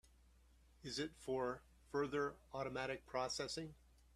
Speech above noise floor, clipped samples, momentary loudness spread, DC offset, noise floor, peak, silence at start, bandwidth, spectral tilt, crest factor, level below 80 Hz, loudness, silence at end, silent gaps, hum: 25 dB; under 0.1%; 7 LU; under 0.1%; -69 dBFS; -28 dBFS; 0.85 s; 14 kHz; -4 dB/octave; 18 dB; -68 dBFS; -44 LUFS; 0.4 s; none; none